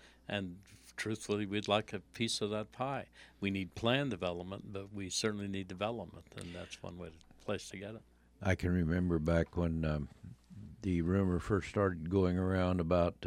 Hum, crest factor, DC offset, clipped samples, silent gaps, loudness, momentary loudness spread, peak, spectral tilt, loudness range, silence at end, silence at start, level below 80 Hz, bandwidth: none; 22 dB; under 0.1%; under 0.1%; none; -36 LUFS; 16 LU; -14 dBFS; -5.5 dB/octave; 6 LU; 0 s; 0.05 s; -52 dBFS; 14.5 kHz